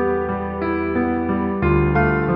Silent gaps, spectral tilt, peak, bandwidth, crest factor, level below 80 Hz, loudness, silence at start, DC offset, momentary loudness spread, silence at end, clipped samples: none; -11.5 dB/octave; -6 dBFS; 5.4 kHz; 14 dB; -32 dBFS; -20 LUFS; 0 s; under 0.1%; 6 LU; 0 s; under 0.1%